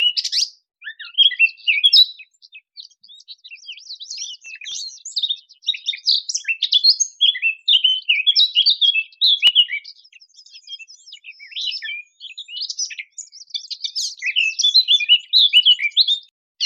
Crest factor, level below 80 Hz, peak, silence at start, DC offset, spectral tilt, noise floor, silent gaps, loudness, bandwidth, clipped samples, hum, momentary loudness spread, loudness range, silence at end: 16 dB; -82 dBFS; -4 dBFS; 0 s; under 0.1%; 7.5 dB/octave; -48 dBFS; 16.31-16.55 s; -15 LUFS; 15.5 kHz; under 0.1%; none; 22 LU; 14 LU; 0 s